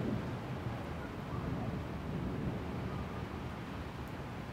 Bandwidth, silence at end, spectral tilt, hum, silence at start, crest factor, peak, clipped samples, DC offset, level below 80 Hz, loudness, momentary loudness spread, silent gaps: 16 kHz; 0 s; -7.5 dB/octave; none; 0 s; 14 dB; -26 dBFS; under 0.1%; under 0.1%; -50 dBFS; -41 LUFS; 5 LU; none